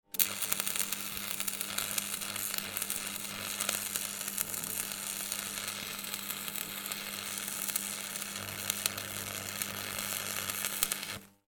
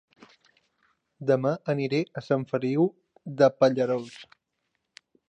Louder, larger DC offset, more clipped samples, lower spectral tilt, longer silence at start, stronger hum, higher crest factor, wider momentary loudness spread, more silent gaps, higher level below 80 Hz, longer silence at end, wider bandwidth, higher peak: second, -34 LUFS vs -26 LUFS; neither; neither; second, -0.5 dB/octave vs -7.5 dB/octave; second, 0.15 s vs 1.2 s; neither; first, 36 dB vs 22 dB; second, 6 LU vs 17 LU; neither; first, -68 dBFS vs -76 dBFS; second, 0.2 s vs 1.05 s; first, 19 kHz vs 8.8 kHz; first, -2 dBFS vs -6 dBFS